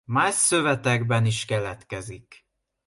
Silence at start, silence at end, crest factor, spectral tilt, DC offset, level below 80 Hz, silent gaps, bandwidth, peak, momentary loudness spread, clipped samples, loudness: 0.1 s; 0.5 s; 16 dB; -4 dB/octave; under 0.1%; -56 dBFS; none; 11.5 kHz; -8 dBFS; 16 LU; under 0.1%; -22 LUFS